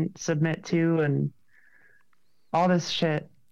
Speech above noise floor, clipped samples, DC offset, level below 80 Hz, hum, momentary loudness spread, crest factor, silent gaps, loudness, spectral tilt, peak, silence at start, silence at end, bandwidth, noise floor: 48 dB; under 0.1%; under 0.1%; -68 dBFS; none; 6 LU; 14 dB; none; -26 LUFS; -6 dB/octave; -12 dBFS; 0 s; 0.25 s; 7.6 kHz; -73 dBFS